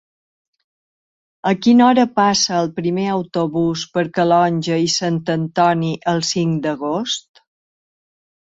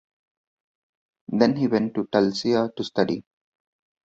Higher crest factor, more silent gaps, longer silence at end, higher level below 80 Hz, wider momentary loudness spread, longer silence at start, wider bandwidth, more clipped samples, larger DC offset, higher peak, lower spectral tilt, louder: second, 16 dB vs 22 dB; neither; first, 1.35 s vs 0.85 s; first, -58 dBFS vs -64 dBFS; about the same, 8 LU vs 6 LU; first, 1.45 s vs 1.3 s; about the same, 8 kHz vs 7.8 kHz; neither; neither; about the same, -2 dBFS vs -4 dBFS; second, -5 dB/octave vs -6.5 dB/octave; first, -17 LUFS vs -23 LUFS